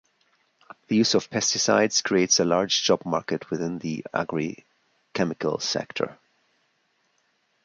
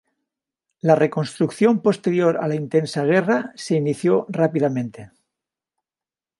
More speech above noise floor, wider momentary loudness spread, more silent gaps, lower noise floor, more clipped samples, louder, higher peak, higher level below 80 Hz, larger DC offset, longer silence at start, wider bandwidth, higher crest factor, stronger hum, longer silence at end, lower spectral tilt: second, 45 dB vs over 71 dB; first, 11 LU vs 6 LU; neither; second, -70 dBFS vs under -90 dBFS; neither; second, -24 LUFS vs -20 LUFS; second, -6 dBFS vs -2 dBFS; about the same, -64 dBFS vs -68 dBFS; neither; about the same, 0.9 s vs 0.85 s; about the same, 10.5 kHz vs 11.5 kHz; about the same, 20 dB vs 20 dB; neither; first, 1.5 s vs 1.35 s; second, -3 dB/octave vs -7 dB/octave